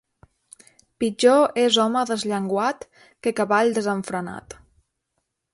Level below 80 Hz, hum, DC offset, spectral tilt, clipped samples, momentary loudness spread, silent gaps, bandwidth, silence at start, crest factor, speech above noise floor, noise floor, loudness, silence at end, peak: -62 dBFS; none; under 0.1%; -4 dB/octave; under 0.1%; 13 LU; none; 11.5 kHz; 1 s; 20 dB; 56 dB; -77 dBFS; -21 LUFS; 1 s; -4 dBFS